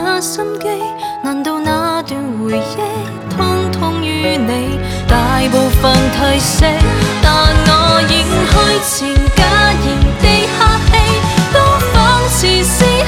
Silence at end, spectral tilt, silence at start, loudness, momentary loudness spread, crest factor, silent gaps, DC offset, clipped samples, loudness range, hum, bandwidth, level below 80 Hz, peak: 0 s; -4.5 dB/octave; 0 s; -12 LUFS; 9 LU; 12 dB; none; under 0.1%; under 0.1%; 7 LU; none; 17.5 kHz; -18 dBFS; 0 dBFS